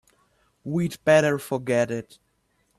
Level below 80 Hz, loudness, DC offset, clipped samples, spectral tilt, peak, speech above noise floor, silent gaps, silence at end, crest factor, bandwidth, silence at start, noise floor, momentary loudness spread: -64 dBFS; -23 LUFS; under 0.1%; under 0.1%; -6 dB/octave; -8 dBFS; 46 dB; none; 0.75 s; 18 dB; 13.5 kHz; 0.65 s; -69 dBFS; 12 LU